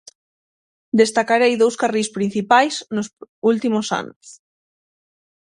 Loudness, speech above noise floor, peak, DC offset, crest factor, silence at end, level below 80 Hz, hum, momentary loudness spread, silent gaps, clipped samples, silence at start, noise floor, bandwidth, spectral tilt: -18 LUFS; over 72 dB; 0 dBFS; under 0.1%; 20 dB; 1.1 s; -66 dBFS; none; 11 LU; 3.13-3.17 s, 3.29-3.42 s, 4.16-4.21 s; under 0.1%; 0.95 s; under -90 dBFS; 11.5 kHz; -4 dB/octave